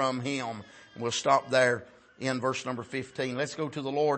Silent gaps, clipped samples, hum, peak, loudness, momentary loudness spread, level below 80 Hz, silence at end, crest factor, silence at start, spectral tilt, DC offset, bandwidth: none; under 0.1%; none; -10 dBFS; -30 LUFS; 11 LU; -72 dBFS; 0 s; 20 dB; 0 s; -4 dB/octave; under 0.1%; 8.8 kHz